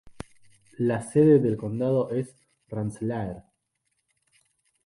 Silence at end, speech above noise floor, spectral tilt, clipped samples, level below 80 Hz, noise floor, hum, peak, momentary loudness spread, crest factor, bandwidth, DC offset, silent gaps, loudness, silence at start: 1.45 s; 53 dB; -8.5 dB/octave; under 0.1%; -58 dBFS; -77 dBFS; none; -8 dBFS; 25 LU; 18 dB; 11.5 kHz; under 0.1%; none; -25 LUFS; 0.05 s